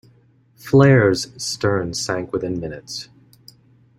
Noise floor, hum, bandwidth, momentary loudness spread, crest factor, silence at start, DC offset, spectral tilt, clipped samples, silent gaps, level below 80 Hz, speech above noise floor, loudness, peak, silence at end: -55 dBFS; none; 13.5 kHz; 18 LU; 18 dB; 0.65 s; under 0.1%; -5.5 dB/octave; under 0.1%; none; -52 dBFS; 37 dB; -19 LUFS; -2 dBFS; 0.95 s